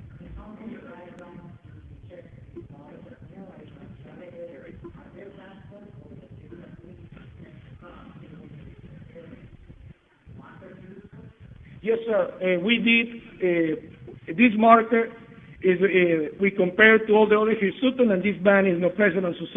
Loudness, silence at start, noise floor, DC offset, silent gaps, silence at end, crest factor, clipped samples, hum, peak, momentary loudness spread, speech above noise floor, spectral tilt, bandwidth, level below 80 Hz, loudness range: -21 LUFS; 0.05 s; -50 dBFS; under 0.1%; none; 0 s; 24 dB; under 0.1%; none; -2 dBFS; 28 LU; 29 dB; -8.5 dB/octave; 3.9 kHz; -56 dBFS; 25 LU